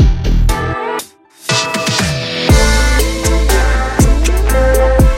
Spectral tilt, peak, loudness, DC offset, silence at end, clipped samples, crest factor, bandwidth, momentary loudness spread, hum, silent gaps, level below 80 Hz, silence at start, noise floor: -4.5 dB/octave; 0 dBFS; -13 LUFS; under 0.1%; 0 s; under 0.1%; 12 dB; 17 kHz; 8 LU; none; none; -14 dBFS; 0 s; -32 dBFS